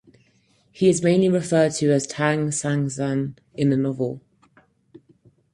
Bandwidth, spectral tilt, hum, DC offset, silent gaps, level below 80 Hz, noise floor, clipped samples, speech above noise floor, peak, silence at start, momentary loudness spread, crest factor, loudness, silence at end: 11.5 kHz; -6 dB/octave; none; under 0.1%; none; -60 dBFS; -62 dBFS; under 0.1%; 41 dB; -4 dBFS; 0.75 s; 9 LU; 18 dB; -22 LUFS; 1.35 s